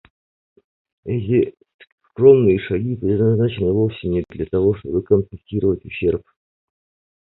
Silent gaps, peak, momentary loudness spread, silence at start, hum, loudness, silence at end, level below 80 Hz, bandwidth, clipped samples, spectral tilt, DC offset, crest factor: 1.74-1.79 s, 1.92-1.98 s; 0 dBFS; 12 LU; 1.05 s; none; -19 LUFS; 1.1 s; -42 dBFS; 4.1 kHz; under 0.1%; -12.5 dB/octave; under 0.1%; 20 dB